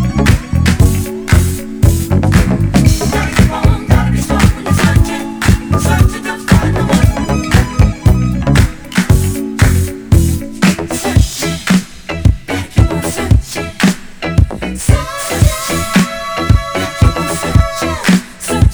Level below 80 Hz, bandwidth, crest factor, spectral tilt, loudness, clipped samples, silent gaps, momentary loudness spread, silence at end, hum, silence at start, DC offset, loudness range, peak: -18 dBFS; over 20 kHz; 12 dB; -5.5 dB/octave; -13 LUFS; 0.8%; none; 6 LU; 0 s; none; 0 s; under 0.1%; 2 LU; 0 dBFS